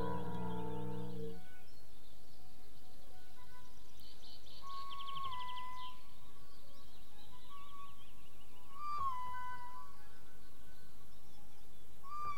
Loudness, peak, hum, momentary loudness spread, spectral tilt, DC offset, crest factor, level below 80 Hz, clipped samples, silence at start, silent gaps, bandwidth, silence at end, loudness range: -47 LUFS; -26 dBFS; none; 19 LU; -5.5 dB/octave; 2%; 18 dB; -64 dBFS; under 0.1%; 0 s; none; 17 kHz; 0 s; 9 LU